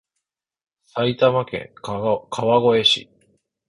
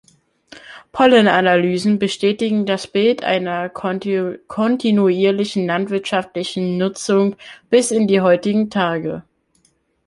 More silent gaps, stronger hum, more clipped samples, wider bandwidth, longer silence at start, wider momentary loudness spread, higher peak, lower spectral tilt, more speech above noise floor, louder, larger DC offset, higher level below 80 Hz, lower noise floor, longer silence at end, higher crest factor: neither; neither; neither; about the same, 11 kHz vs 11.5 kHz; first, 0.95 s vs 0.55 s; first, 15 LU vs 10 LU; about the same, -4 dBFS vs -2 dBFS; about the same, -5 dB/octave vs -5.5 dB/octave; first, 61 dB vs 45 dB; about the same, -19 LUFS vs -17 LUFS; neither; about the same, -58 dBFS vs -60 dBFS; first, -81 dBFS vs -62 dBFS; second, 0.65 s vs 0.85 s; about the same, 18 dB vs 16 dB